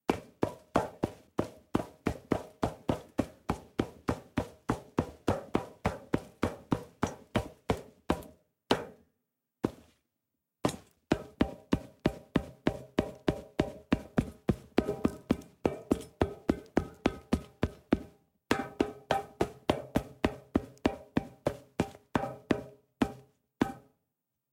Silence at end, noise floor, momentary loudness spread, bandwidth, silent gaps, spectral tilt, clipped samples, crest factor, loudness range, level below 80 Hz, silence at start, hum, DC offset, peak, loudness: 0.75 s; -85 dBFS; 5 LU; 16.5 kHz; none; -6.5 dB/octave; under 0.1%; 24 dB; 3 LU; -50 dBFS; 0.1 s; none; under 0.1%; -10 dBFS; -35 LUFS